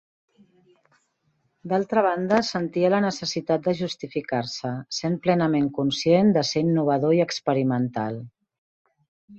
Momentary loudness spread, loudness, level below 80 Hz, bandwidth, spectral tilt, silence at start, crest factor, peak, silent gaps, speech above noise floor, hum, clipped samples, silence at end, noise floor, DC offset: 9 LU; -23 LUFS; -64 dBFS; 8.2 kHz; -6 dB/octave; 1.65 s; 18 dB; -6 dBFS; 8.58-8.85 s, 9.08-9.28 s; 47 dB; none; under 0.1%; 0 s; -70 dBFS; under 0.1%